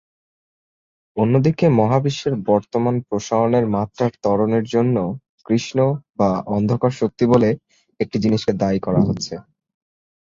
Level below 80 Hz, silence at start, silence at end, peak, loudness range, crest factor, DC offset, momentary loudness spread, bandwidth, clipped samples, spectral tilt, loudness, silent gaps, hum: -50 dBFS; 1.15 s; 0.85 s; -2 dBFS; 1 LU; 16 dB; under 0.1%; 8 LU; 7.6 kHz; under 0.1%; -7.5 dB/octave; -19 LUFS; 5.29-5.38 s; none